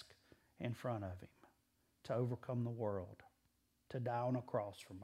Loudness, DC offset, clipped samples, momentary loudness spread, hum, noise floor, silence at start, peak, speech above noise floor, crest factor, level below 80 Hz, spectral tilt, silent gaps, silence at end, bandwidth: -43 LUFS; under 0.1%; under 0.1%; 17 LU; none; -80 dBFS; 0 s; -26 dBFS; 37 dB; 20 dB; -78 dBFS; -8 dB/octave; none; 0 s; 13.5 kHz